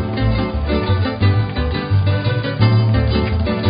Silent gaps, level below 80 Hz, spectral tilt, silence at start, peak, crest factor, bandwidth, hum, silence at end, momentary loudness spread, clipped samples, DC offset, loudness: none; -24 dBFS; -12.5 dB/octave; 0 s; -2 dBFS; 14 dB; 5.2 kHz; none; 0 s; 5 LU; under 0.1%; under 0.1%; -17 LUFS